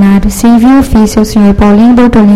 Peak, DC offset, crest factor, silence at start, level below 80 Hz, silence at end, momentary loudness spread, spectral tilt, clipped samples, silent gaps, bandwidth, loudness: 0 dBFS; under 0.1%; 4 dB; 0 s; -18 dBFS; 0 s; 3 LU; -6.5 dB/octave; 5%; none; 15 kHz; -5 LUFS